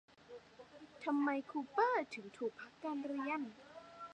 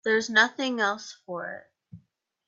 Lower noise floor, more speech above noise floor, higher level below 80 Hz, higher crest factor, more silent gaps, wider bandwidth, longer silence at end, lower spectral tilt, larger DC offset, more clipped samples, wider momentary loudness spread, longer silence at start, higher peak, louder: second, -59 dBFS vs -64 dBFS; second, 20 dB vs 37 dB; second, -84 dBFS vs -76 dBFS; about the same, 20 dB vs 22 dB; neither; first, 9 kHz vs 7.8 kHz; second, 0 s vs 0.5 s; first, -5 dB/octave vs -2.5 dB/octave; neither; neither; first, 22 LU vs 17 LU; first, 0.3 s vs 0.05 s; second, -22 dBFS vs -6 dBFS; second, -40 LUFS vs -25 LUFS